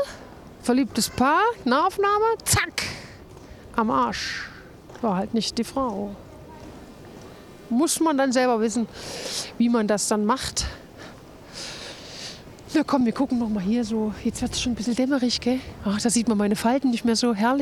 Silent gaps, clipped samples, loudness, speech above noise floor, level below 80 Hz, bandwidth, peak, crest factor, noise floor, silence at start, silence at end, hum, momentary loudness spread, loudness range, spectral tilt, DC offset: none; under 0.1%; -23 LUFS; 21 dB; -48 dBFS; 15.5 kHz; -8 dBFS; 18 dB; -44 dBFS; 0 s; 0 s; none; 22 LU; 5 LU; -4 dB/octave; under 0.1%